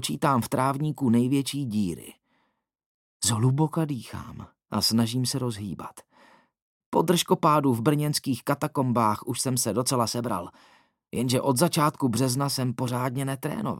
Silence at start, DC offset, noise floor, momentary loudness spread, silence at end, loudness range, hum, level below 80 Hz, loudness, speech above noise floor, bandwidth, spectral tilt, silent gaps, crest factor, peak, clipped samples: 0 s; under 0.1%; -74 dBFS; 12 LU; 0 s; 4 LU; none; -64 dBFS; -25 LUFS; 48 dB; 17 kHz; -5 dB/octave; 2.86-3.20 s, 6.62-6.92 s; 20 dB; -6 dBFS; under 0.1%